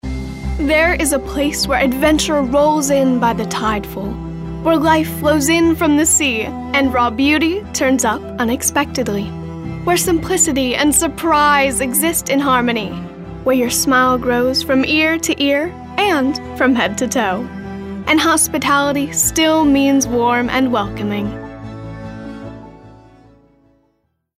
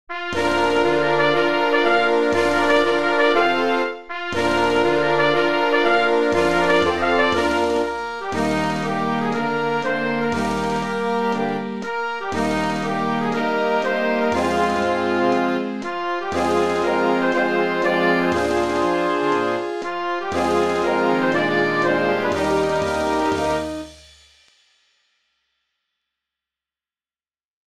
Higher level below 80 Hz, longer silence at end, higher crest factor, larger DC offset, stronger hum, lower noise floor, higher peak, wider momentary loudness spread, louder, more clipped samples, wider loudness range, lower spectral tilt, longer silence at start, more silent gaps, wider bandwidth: first, -34 dBFS vs -48 dBFS; first, 1.4 s vs 0.15 s; about the same, 14 dB vs 16 dB; second, under 0.1% vs 0.7%; neither; second, -65 dBFS vs under -90 dBFS; about the same, -2 dBFS vs -4 dBFS; first, 13 LU vs 8 LU; first, -15 LUFS vs -20 LUFS; neither; about the same, 3 LU vs 5 LU; second, -3.5 dB/octave vs -5 dB/octave; about the same, 0.05 s vs 0.1 s; second, none vs 27.45-27.54 s; first, 16 kHz vs 14 kHz